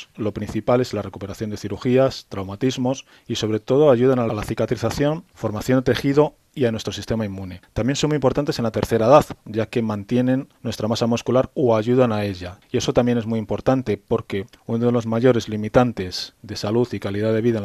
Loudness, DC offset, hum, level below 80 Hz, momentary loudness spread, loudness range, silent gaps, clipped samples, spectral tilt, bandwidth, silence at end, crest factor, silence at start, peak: -21 LUFS; under 0.1%; none; -48 dBFS; 11 LU; 2 LU; none; under 0.1%; -6.5 dB/octave; 14 kHz; 0 s; 20 dB; 0 s; 0 dBFS